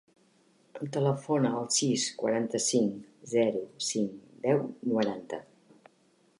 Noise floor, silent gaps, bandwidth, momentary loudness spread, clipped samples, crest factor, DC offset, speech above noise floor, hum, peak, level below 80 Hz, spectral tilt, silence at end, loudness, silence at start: -66 dBFS; none; 11.5 kHz; 13 LU; under 0.1%; 18 dB; under 0.1%; 37 dB; none; -12 dBFS; -78 dBFS; -4.5 dB/octave; 1 s; -29 LUFS; 0.75 s